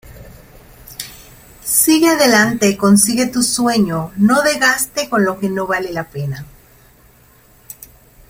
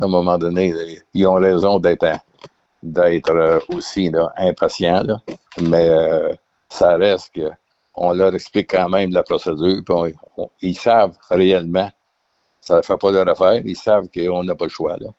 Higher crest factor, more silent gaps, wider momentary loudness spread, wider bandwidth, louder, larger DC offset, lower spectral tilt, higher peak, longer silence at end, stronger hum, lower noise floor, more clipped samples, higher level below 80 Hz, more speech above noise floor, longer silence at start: about the same, 16 dB vs 14 dB; neither; first, 19 LU vs 11 LU; first, 16.5 kHz vs 8 kHz; first, -14 LUFS vs -17 LUFS; neither; second, -3.5 dB/octave vs -6.5 dB/octave; about the same, 0 dBFS vs -2 dBFS; first, 1.85 s vs 0.05 s; neither; second, -48 dBFS vs -67 dBFS; neither; about the same, -48 dBFS vs -50 dBFS; second, 34 dB vs 51 dB; about the same, 0.05 s vs 0 s